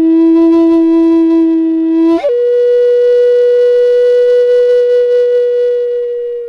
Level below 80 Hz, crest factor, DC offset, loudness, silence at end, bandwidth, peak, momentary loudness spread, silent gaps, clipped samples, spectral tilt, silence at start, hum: -52 dBFS; 6 dB; under 0.1%; -9 LUFS; 0 s; 5.8 kHz; -2 dBFS; 4 LU; none; under 0.1%; -6 dB/octave; 0 s; none